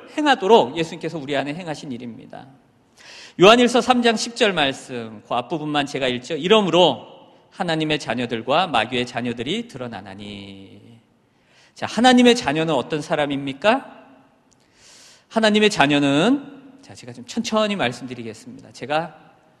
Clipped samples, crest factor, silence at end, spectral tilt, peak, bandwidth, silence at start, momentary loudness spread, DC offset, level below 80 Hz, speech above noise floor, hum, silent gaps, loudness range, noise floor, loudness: under 0.1%; 20 dB; 0.5 s; -4.5 dB/octave; 0 dBFS; 12 kHz; 0 s; 20 LU; under 0.1%; -58 dBFS; 39 dB; none; none; 6 LU; -59 dBFS; -19 LUFS